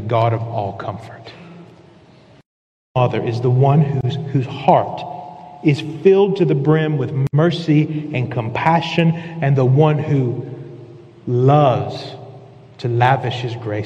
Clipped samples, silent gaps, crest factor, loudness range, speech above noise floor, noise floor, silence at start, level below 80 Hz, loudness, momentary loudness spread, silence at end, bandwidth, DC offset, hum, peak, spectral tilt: under 0.1%; 2.46-2.95 s; 18 dB; 4 LU; 30 dB; -47 dBFS; 0 s; -56 dBFS; -17 LUFS; 18 LU; 0 s; 7.8 kHz; under 0.1%; none; 0 dBFS; -8.5 dB/octave